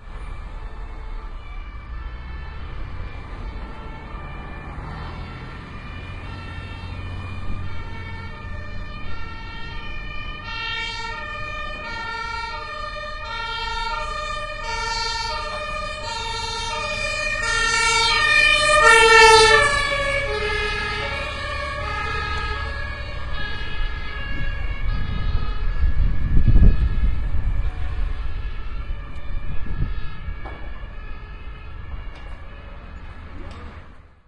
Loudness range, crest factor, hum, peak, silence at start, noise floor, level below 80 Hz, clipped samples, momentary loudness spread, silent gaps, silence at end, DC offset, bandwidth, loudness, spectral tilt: 21 LU; 22 dB; none; 0 dBFS; 0 s; -42 dBFS; -28 dBFS; under 0.1%; 21 LU; none; 0.2 s; under 0.1%; 11.5 kHz; -21 LUFS; -3 dB/octave